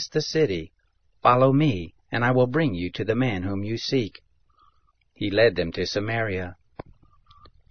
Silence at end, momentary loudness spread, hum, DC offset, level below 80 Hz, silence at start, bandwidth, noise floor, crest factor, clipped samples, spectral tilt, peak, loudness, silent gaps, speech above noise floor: 0.9 s; 13 LU; none; 0.5%; -54 dBFS; 0 s; 6.6 kHz; -64 dBFS; 22 dB; under 0.1%; -6.5 dB/octave; -4 dBFS; -24 LUFS; none; 41 dB